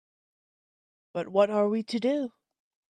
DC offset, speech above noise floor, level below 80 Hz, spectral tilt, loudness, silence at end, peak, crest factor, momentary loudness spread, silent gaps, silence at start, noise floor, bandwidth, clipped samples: under 0.1%; over 64 dB; -78 dBFS; -6.5 dB/octave; -27 LUFS; 0.6 s; -10 dBFS; 20 dB; 13 LU; none; 1.15 s; under -90 dBFS; 9.8 kHz; under 0.1%